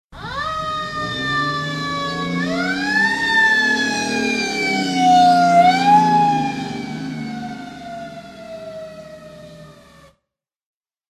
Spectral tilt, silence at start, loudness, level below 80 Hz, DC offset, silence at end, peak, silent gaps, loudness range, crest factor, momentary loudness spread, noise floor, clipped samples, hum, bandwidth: -4 dB/octave; 0.1 s; -17 LUFS; -50 dBFS; under 0.1%; 1.4 s; -2 dBFS; none; 19 LU; 16 dB; 21 LU; -80 dBFS; under 0.1%; none; 13.5 kHz